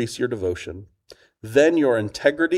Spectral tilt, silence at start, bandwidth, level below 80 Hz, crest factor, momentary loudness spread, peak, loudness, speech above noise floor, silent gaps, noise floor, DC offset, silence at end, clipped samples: -5.5 dB/octave; 0 s; 15 kHz; -54 dBFS; 18 dB; 20 LU; -4 dBFS; -21 LUFS; 31 dB; none; -52 dBFS; under 0.1%; 0 s; under 0.1%